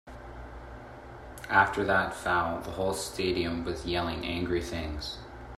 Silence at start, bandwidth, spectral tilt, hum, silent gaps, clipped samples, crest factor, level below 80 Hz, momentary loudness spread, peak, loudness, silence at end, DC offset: 0.05 s; 15 kHz; -4.5 dB/octave; none; none; under 0.1%; 22 dB; -48 dBFS; 21 LU; -8 dBFS; -29 LUFS; 0 s; under 0.1%